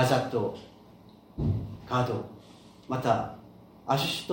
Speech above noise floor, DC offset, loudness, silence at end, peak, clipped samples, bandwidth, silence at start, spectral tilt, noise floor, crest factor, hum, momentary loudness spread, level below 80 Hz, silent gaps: 25 dB; under 0.1%; -30 LUFS; 0 s; -10 dBFS; under 0.1%; 17 kHz; 0 s; -5.5 dB/octave; -53 dBFS; 20 dB; none; 20 LU; -52 dBFS; none